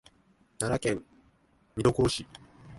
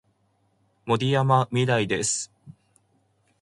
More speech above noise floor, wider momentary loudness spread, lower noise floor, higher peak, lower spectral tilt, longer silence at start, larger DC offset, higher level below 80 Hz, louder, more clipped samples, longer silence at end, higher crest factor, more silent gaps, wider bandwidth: second, 37 dB vs 45 dB; first, 19 LU vs 11 LU; about the same, -65 dBFS vs -68 dBFS; about the same, -8 dBFS vs -6 dBFS; about the same, -5 dB/octave vs -4.5 dB/octave; second, 0.6 s vs 0.85 s; neither; first, -50 dBFS vs -62 dBFS; second, -29 LUFS vs -23 LUFS; neither; second, 0 s vs 0.9 s; about the same, 24 dB vs 20 dB; neither; about the same, 12 kHz vs 11.5 kHz